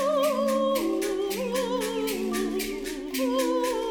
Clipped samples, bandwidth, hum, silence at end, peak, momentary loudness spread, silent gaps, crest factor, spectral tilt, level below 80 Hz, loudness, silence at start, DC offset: under 0.1%; 19 kHz; none; 0 s; -14 dBFS; 5 LU; none; 12 dB; -3.5 dB/octave; -52 dBFS; -27 LUFS; 0 s; under 0.1%